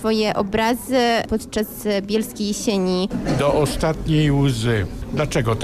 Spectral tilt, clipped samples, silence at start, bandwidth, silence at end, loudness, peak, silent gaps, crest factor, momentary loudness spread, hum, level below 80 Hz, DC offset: -5.5 dB/octave; under 0.1%; 0 s; 15.5 kHz; 0 s; -20 LUFS; -8 dBFS; none; 12 dB; 6 LU; none; -36 dBFS; under 0.1%